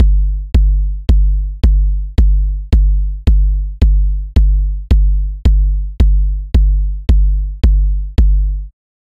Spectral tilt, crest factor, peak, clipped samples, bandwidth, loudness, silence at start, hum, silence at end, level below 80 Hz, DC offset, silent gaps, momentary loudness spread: -8.5 dB/octave; 8 dB; -2 dBFS; under 0.1%; 4.7 kHz; -15 LUFS; 0 s; none; 0.35 s; -12 dBFS; under 0.1%; none; 4 LU